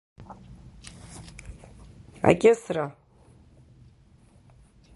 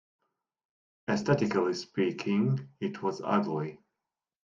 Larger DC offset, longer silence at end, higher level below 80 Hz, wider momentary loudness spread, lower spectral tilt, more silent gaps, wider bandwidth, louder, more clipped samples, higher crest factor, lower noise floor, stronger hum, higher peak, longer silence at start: neither; first, 2.05 s vs 0.65 s; first, -52 dBFS vs -68 dBFS; first, 28 LU vs 9 LU; about the same, -6 dB/octave vs -7 dB/octave; neither; first, 11.5 kHz vs 7.4 kHz; first, -23 LUFS vs -30 LUFS; neither; first, 28 dB vs 20 dB; second, -56 dBFS vs -89 dBFS; neither; first, -2 dBFS vs -12 dBFS; second, 0.2 s vs 1.1 s